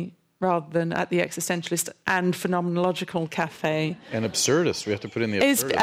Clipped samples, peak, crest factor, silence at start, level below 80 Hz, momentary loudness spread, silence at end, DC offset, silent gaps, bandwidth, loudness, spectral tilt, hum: under 0.1%; -8 dBFS; 16 dB; 0 s; -64 dBFS; 7 LU; 0 s; under 0.1%; none; 16 kHz; -25 LUFS; -4 dB/octave; none